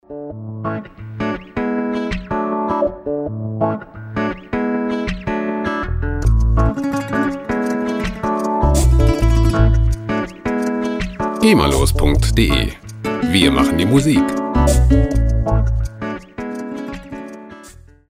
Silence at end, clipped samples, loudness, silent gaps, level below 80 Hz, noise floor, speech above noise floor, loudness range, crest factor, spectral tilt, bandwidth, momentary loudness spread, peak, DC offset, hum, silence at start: 0.4 s; under 0.1%; -18 LUFS; none; -22 dBFS; -41 dBFS; 27 dB; 6 LU; 16 dB; -6 dB/octave; 16 kHz; 14 LU; 0 dBFS; under 0.1%; none; 0.1 s